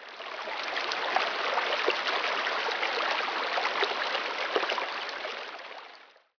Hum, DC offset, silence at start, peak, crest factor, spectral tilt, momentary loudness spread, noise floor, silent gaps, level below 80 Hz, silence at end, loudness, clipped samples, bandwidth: none; under 0.1%; 0 s; -10 dBFS; 20 dB; -0.5 dB/octave; 11 LU; -53 dBFS; none; -78 dBFS; 0.3 s; -29 LUFS; under 0.1%; 5.4 kHz